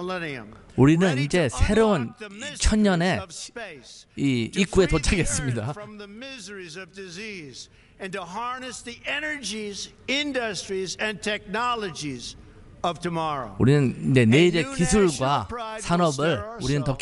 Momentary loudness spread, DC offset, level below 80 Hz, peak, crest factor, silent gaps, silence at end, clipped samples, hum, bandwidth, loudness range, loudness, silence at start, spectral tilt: 17 LU; under 0.1%; -38 dBFS; -4 dBFS; 22 dB; none; 0 s; under 0.1%; none; 11.5 kHz; 10 LU; -24 LUFS; 0 s; -5 dB/octave